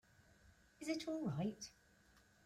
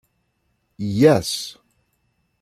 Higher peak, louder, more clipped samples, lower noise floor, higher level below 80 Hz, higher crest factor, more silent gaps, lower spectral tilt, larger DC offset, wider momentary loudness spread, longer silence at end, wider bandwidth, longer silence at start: second, -30 dBFS vs -2 dBFS; second, -45 LUFS vs -19 LUFS; neither; about the same, -71 dBFS vs -69 dBFS; second, -76 dBFS vs -58 dBFS; about the same, 18 dB vs 20 dB; neither; about the same, -5.5 dB/octave vs -5.5 dB/octave; neither; second, 12 LU vs 15 LU; second, 0.25 s vs 0.9 s; about the same, 15.5 kHz vs 14.5 kHz; second, 0.45 s vs 0.8 s